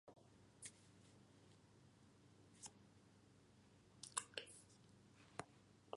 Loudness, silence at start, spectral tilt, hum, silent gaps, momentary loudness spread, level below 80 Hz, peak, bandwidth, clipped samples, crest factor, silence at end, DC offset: -54 LUFS; 0.05 s; -2 dB/octave; none; none; 20 LU; -84 dBFS; -24 dBFS; 11.5 kHz; under 0.1%; 36 dB; 0 s; under 0.1%